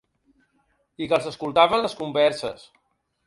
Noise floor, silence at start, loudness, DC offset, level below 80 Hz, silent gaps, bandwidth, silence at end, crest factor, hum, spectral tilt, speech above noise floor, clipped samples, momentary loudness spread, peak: -68 dBFS; 1 s; -22 LUFS; under 0.1%; -62 dBFS; none; 11.5 kHz; 0.7 s; 22 dB; none; -4.5 dB/octave; 46 dB; under 0.1%; 15 LU; -4 dBFS